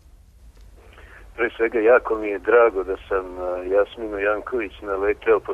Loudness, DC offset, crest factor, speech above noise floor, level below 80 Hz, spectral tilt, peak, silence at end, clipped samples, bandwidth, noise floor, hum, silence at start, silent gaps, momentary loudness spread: -21 LUFS; under 0.1%; 18 dB; 27 dB; -46 dBFS; -6.5 dB/octave; -6 dBFS; 0 s; under 0.1%; 4.3 kHz; -48 dBFS; none; 0.45 s; none; 11 LU